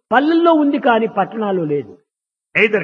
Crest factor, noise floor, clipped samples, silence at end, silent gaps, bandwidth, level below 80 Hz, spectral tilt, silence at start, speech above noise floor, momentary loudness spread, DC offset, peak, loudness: 16 dB; -83 dBFS; under 0.1%; 0 s; none; 6.6 kHz; -64 dBFS; -7.5 dB/octave; 0.1 s; 68 dB; 8 LU; under 0.1%; 0 dBFS; -16 LUFS